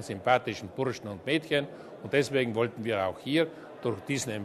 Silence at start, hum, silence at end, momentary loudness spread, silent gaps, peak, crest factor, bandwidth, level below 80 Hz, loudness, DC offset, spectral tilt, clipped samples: 0 s; none; 0 s; 9 LU; none; -10 dBFS; 20 dB; 13.5 kHz; -66 dBFS; -30 LUFS; under 0.1%; -5 dB/octave; under 0.1%